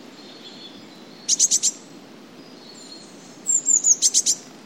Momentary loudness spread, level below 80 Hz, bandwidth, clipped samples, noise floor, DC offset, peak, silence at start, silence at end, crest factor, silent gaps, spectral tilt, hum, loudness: 25 LU; -82 dBFS; 16.5 kHz; under 0.1%; -44 dBFS; under 0.1%; -4 dBFS; 0.2 s; 0.15 s; 20 dB; none; 1 dB/octave; none; -17 LUFS